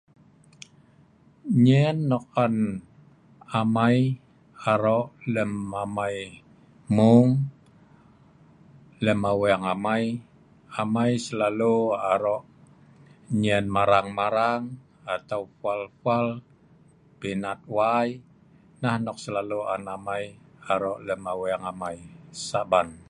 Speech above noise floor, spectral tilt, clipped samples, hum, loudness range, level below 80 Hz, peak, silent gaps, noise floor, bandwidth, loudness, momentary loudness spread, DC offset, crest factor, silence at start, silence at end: 33 dB; -7 dB/octave; under 0.1%; none; 6 LU; -60 dBFS; -4 dBFS; none; -57 dBFS; 11.5 kHz; -25 LUFS; 13 LU; under 0.1%; 20 dB; 1.45 s; 0.1 s